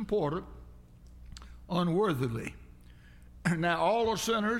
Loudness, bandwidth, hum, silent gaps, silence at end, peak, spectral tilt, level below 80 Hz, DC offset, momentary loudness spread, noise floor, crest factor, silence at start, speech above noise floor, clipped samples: -30 LUFS; 16.5 kHz; 60 Hz at -55 dBFS; none; 0 s; -14 dBFS; -5.5 dB/octave; -52 dBFS; under 0.1%; 22 LU; -53 dBFS; 18 dB; 0 s; 24 dB; under 0.1%